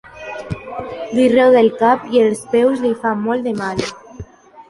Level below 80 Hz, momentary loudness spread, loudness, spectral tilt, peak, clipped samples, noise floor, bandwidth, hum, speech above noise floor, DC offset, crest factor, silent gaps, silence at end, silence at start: -48 dBFS; 16 LU; -15 LUFS; -5.5 dB/octave; -2 dBFS; under 0.1%; -36 dBFS; 11.5 kHz; none; 22 dB; under 0.1%; 14 dB; none; 0.1 s; 0.15 s